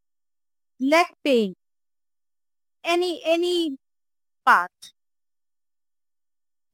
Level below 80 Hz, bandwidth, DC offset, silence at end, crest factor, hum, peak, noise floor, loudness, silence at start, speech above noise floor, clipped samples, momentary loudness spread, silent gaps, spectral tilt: -76 dBFS; 16.5 kHz; under 0.1%; 1.85 s; 22 dB; none; -4 dBFS; under -90 dBFS; -22 LUFS; 0.8 s; over 69 dB; under 0.1%; 12 LU; none; -3.5 dB/octave